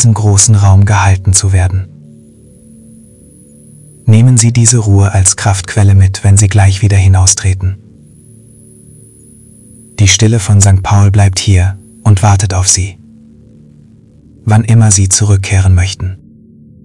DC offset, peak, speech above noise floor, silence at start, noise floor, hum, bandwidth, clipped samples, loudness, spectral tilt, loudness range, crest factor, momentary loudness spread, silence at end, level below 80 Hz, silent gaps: under 0.1%; 0 dBFS; 33 dB; 0 s; -40 dBFS; none; 12 kHz; 0.9%; -8 LUFS; -4.5 dB/octave; 6 LU; 10 dB; 10 LU; 0.7 s; -36 dBFS; none